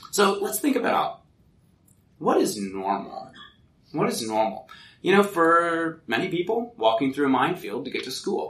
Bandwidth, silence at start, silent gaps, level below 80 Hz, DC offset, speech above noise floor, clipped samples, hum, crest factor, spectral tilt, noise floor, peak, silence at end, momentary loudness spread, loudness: 15.5 kHz; 0 s; none; -66 dBFS; under 0.1%; 36 dB; under 0.1%; none; 18 dB; -4 dB/octave; -60 dBFS; -6 dBFS; 0 s; 11 LU; -24 LUFS